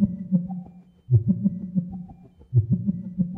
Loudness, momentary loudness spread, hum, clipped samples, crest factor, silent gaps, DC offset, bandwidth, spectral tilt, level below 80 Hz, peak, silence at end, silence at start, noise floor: -25 LUFS; 16 LU; none; under 0.1%; 16 dB; none; under 0.1%; 1 kHz; -14.5 dB/octave; -50 dBFS; -8 dBFS; 0 s; 0 s; -46 dBFS